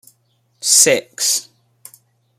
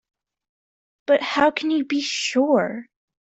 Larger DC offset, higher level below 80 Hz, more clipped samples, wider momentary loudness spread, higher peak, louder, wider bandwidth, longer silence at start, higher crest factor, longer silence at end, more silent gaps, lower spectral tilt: neither; about the same, -70 dBFS vs -66 dBFS; neither; about the same, 10 LU vs 10 LU; first, 0 dBFS vs -4 dBFS; first, -13 LUFS vs -21 LUFS; first, 16.5 kHz vs 8.2 kHz; second, 0.65 s vs 1.1 s; about the same, 20 dB vs 18 dB; first, 0.95 s vs 0.4 s; neither; second, 0 dB/octave vs -3.5 dB/octave